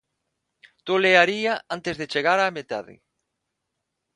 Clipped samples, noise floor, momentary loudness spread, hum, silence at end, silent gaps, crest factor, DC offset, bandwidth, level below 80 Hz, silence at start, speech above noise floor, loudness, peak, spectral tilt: under 0.1%; -80 dBFS; 16 LU; none; 1.2 s; none; 24 dB; under 0.1%; 11 kHz; -66 dBFS; 0.85 s; 58 dB; -21 LUFS; -2 dBFS; -4 dB/octave